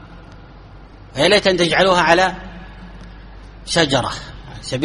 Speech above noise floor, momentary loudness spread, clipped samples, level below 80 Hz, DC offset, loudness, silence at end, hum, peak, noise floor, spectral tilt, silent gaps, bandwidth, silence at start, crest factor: 24 dB; 24 LU; under 0.1%; -40 dBFS; under 0.1%; -15 LUFS; 0 s; none; 0 dBFS; -40 dBFS; -4 dB/octave; none; 11.5 kHz; 0.05 s; 20 dB